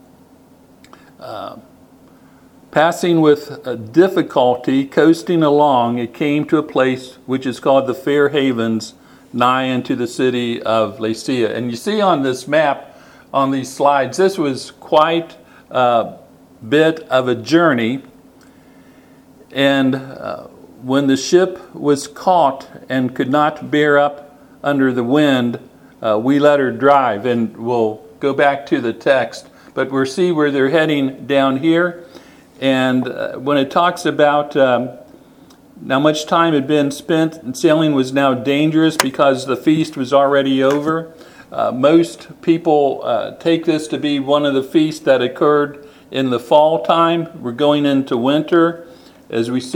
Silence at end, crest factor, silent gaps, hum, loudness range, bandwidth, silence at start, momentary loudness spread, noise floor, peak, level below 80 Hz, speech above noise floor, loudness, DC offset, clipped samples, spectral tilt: 0 s; 16 dB; none; none; 3 LU; 17.5 kHz; 1.2 s; 10 LU; -47 dBFS; 0 dBFS; -62 dBFS; 32 dB; -16 LUFS; under 0.1%; under 0.1%; -5.5 dB/octave